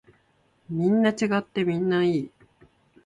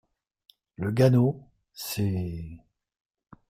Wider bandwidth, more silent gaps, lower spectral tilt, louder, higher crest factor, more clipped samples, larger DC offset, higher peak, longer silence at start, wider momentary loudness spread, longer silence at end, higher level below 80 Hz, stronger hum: second, 10.5 kHz vs 16 kHz; neither; about the same, -6.5 dB/octave vs -7 dB/octave; about the same, -24 LUFS vs -26 LUFS; about the same, 18 dB vs 20 dB; neither; neither; about the same, -8 dBFS vs -10 dBFS; about the same, 0.7 s vs 0.8 s; second, 9 LU vs 19 LU; about the same, 0.8 s vs 0.9 s; second, -66 dBFS vs -56 dBFS; neither